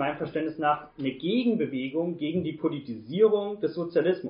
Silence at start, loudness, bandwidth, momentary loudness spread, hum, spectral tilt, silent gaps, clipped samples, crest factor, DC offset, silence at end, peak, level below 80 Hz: 0 s; -28 LUFS; 5.4 kHz; 8 LU; none; -5 dB/octave; none; under 0.1%; 18 dB; under 0.1%; 0 s; -10 dBFS; -68 dBFS